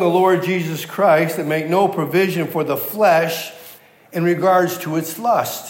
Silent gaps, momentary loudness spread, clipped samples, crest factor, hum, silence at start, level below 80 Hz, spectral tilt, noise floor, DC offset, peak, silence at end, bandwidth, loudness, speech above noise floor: none; 8 LU; under 0.1%; 16 dB; none; 0 s; -76 dBFS; -5.5 dB/octave; -43 dBFS; under 0.1%; -2 dBFS; 0 s; 16.5 kHz; -18 LUFS; 26 dB